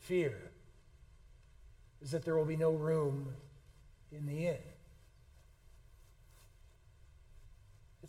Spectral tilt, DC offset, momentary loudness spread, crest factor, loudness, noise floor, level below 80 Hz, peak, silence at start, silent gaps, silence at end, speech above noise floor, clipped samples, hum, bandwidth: -7.5 dB/octave; under 0.1%; 22 LU; 20 dB; -37 LUFS; -62 dBFS; -62 dBFS; -22 dBFS; 0 s; none; 0 s; 27 dB; under 0.1%; none; 14.5 kHz